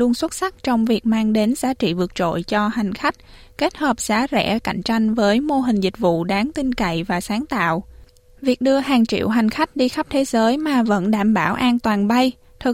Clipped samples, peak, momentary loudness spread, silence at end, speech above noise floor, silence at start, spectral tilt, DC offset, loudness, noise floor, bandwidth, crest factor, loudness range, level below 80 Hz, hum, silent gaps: under 0.1%; -4 dBFS; 5 LU; 0 s; 27 dB; 0 s; -5 dB/octave; under 0.1%; -19 LUFS; -46 dBFS; 16 kHz; 14 dB; 3 LU; -46 dBFS; none; none